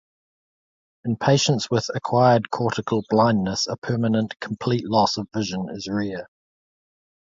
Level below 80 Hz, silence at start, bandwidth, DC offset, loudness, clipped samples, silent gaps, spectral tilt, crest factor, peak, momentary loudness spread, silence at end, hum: -56 dBFS; 1.05 s; 7.8 kHz; under 0.1%; -22 LUFS; under 0.1%; 3.78-3.82 s; -5.5 dB/octave; 18 dB; -4 dBFS; 10 LU; 1 s; none